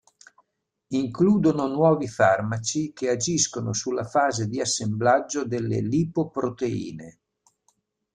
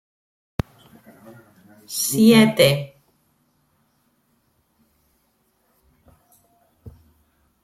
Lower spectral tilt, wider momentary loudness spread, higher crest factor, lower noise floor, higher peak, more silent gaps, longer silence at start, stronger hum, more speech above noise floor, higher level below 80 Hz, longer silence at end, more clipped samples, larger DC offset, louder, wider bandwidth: about the same, -5 dB/octave vs -4.5 dB/octave; second, 7 LU vs 21 LU; about the same, 18 dB vs 22 dB; first, -74 dBFS vs -66 dBFS; second, -6 dBFS vs -2 dBFS; neither; second, 0.9 s vs 1.9 s; neither; about the same, 50 dB vs 51 dB; second, -60 dBFS vs -50 dBFS; first, 1.05 s vs 0.75 s; neither; neither; second, -24 LUFS vs -18 LUFS; second, 10.5 kHz vs 16.5 kHz